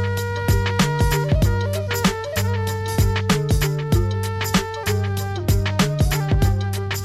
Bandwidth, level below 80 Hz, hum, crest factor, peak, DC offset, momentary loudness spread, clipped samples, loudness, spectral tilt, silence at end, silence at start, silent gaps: 15 kHz; -28 dBFS; none; 12 dB; -6 dBFS; under 0.1%; 4 LU; under 0.1%; -21 LUFS; -5.5 dB/octave; 0 s; 0 s; none